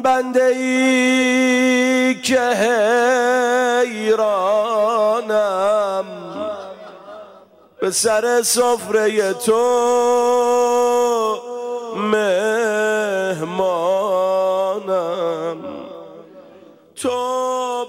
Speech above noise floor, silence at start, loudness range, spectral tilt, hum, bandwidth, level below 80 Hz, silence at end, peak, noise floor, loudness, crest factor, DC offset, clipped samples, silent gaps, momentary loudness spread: 30 dB; 0 s; 6 LU; -3 dB/octave; none; 16 kHz; -68 dBFS; 0 s; -6 dBFS; -46 dBFS; -17 LUFS; 12 dB; under 0.1%; under 0.1%; none; 12 LU